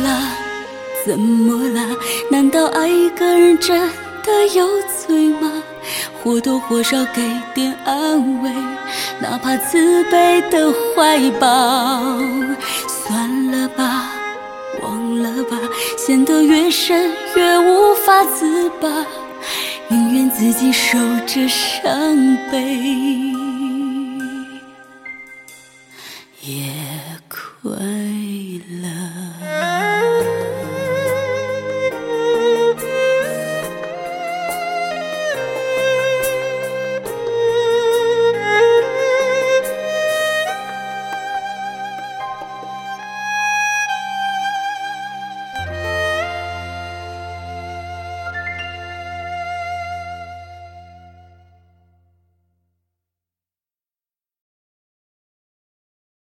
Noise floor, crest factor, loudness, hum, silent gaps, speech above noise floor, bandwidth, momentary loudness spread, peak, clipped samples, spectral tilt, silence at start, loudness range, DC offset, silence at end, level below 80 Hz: under -90 dBFS; 18 dB; -17 LUFS; none; none; over 75 dB; 17 kHz; 16 LU; 0 dBFS; under 0.1%; -3.5 dB/octave; 0 s; 13 LU; under 0.1%; 5.25 s; -54 dBFS